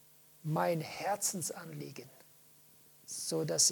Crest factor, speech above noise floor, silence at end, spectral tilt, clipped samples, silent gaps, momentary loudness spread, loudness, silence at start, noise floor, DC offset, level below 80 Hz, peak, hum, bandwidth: 22 dB; 27 dB; 0 s; -2.5 dB/octave; under 0.1%; none; 16 LU; -35 LUFS; 0.45 s; -62 dBFS; under 0.1%; -82 dBFS; -14 dBFS; none; 19 kHz